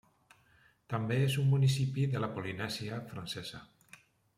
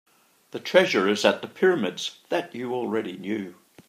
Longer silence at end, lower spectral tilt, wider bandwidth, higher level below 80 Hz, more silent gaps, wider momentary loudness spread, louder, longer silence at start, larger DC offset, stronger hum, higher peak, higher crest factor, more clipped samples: first, 0.75 s vs 0.35 s; first, -6 dB/octave vs -4.5 dB/octave; about the same, 14.5 kHz vs 15 kHz; first, -68 dBFS vs -78 dBFS; neither; about the same, 13 LU vs 12 LU; second, -33 LUFS vs -24 LUFS; first, 0.9 s vs 0.55 s; neither; neither; second, -18 dBFS vs -2 dBFS; second, 16 dB vs 22 dB; neither